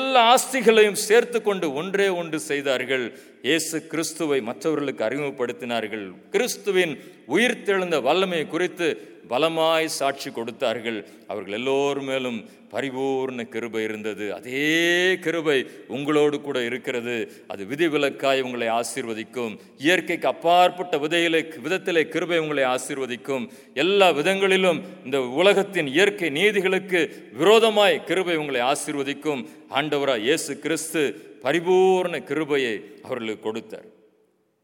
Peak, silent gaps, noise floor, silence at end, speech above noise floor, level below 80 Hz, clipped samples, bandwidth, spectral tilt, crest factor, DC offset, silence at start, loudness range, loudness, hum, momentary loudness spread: -2 dBFS; none; -65 dBFS; 0.75 s; 42 dB; -80 dBFS; under 0.1%; 19 kHz; -3.5 dB/octave; 20 dB; under 0.1%; 0 s; 5 LU; -23 LUFS; none; 13 LU